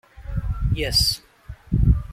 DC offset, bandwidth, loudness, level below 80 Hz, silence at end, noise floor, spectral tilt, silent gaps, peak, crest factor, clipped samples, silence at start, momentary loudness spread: under 0.1%; 16 kHz; -22 LUFS; -26 dBFS; 0 s; -42 dBFS; -4.5 dB/octave; none; -6 dBFS; 16 dB; under 0.1%; 0.2 s; 13 LU